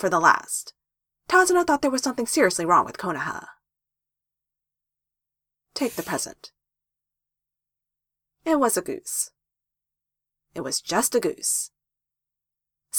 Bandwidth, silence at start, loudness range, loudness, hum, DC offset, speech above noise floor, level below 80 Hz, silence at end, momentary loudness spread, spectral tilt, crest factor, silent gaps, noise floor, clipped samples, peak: 19.5 kHz; 0 s; 12 LU; -23 LUFS; none; under 0.1%; 64 dB; -64 dBFS; 0 s; 15 LU; -2.5 dB/octave; 24 dB; none; -87 dBFS; under 0.1%; -2 dBFS